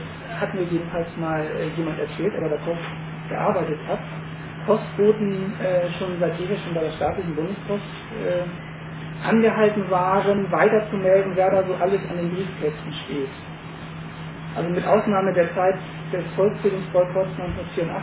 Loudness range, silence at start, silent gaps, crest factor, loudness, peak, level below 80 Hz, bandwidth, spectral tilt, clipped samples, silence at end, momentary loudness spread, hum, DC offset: 6 LU; 0 s; none; 18 dB; -23 LUFS; -4 dBFS; -50 dBFS; 4 kHz; -11 dB/octave; under 0.1%; 0 s; 14 LU; none; under 0.1%